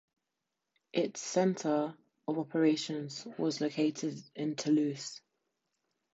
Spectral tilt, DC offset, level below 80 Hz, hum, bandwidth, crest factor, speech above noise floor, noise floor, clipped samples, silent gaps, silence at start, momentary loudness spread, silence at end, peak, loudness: -5 dB/octave; under 0.1%; -84 dBFS; none; 8 kHz; 18 dB; 55 dB; -87 dBFS; under 0.1%; none; 0.95 s; 11 LU; 0.95 s; -16 dBFS; -33 LUFS